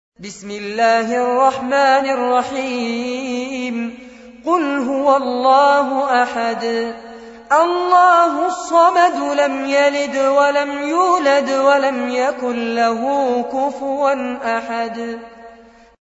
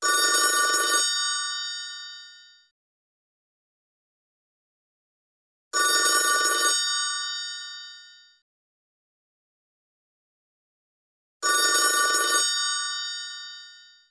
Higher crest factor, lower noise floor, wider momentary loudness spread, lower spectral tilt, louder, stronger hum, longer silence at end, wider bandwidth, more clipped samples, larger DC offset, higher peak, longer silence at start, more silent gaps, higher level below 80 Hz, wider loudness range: second, 14 dB vs 20 dB; second, -44 dBFS vs -50 dBFS; second, 11 LU vs 18 LU; first, -3.5 dB/octave vs 3.5 dB/octave; first, -16 LUFS vs -22 LUFS; neither; first, 0.5 s vs 0.3 s; second, 8 kHz vs 11 kHz; neither; neither; first, -2 dBFS vs -8 dBFS; first, 0.2 s vs 0 s; second, none vs 2.71-5.71 s, 8.42-11.40 s; first, -60 dBFS vs -86 dBFS; second, 5 LU vs 14 LU